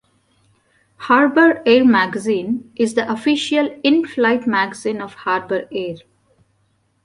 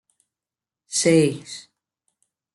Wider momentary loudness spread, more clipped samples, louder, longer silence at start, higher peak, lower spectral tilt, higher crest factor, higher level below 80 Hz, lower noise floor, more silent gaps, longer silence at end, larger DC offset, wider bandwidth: second, 13 LU vs 20 LU; neither; first, -17 LUFS vs -20 LUFS; about the same, 1 s vs 0.9 s; first, -2 dBFS vs -6 dBFS; about the same, -4.5 dB/octave vs -4.5 dB/octave; about the same, 16 dB vs 20 dB; about the same, -62 dBFS vs -66 dBFS; second, -63 dBFS vs under -90 dBFS; neither; about the same, 1.05 s vs 0.95 s; neither; about the same, 11.5 kHz vs 11.5 kHz